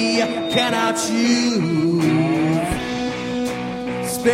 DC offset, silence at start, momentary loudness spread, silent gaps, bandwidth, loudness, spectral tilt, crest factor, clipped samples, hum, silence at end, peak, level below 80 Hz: under 0.1%; 0 s; 7 LU; none; 16.5 kHz; -20 LUFS; -4.5 dB/octave; 14 dB; under 0.1%; none; 0 s; -4 dBFS; -44 dBFS